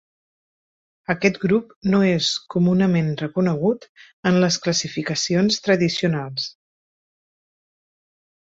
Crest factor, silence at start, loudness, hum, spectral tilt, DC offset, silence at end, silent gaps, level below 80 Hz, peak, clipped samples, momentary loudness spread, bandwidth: 18 dB; 1.1 s; -20 LUFS; none; -5 dB/octave; under 0.1%; 1.95 s; 1.76-1.81 s, 3.89-3.95 s, 4.13-4.23 s; -58 dBFS; -4 dBFS; under 0.1%; 8 LU; 7.8 kHz